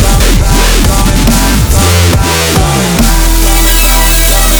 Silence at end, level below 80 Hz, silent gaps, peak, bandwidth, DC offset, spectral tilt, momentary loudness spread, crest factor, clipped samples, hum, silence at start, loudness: 0 s; -10 dBFS; none; 0 dBFS; over 20 kHz; 0.6%; -3.5 dB/octave; 2 LU; 6 dB; 0.7%; none; 0 s; -8 LUFS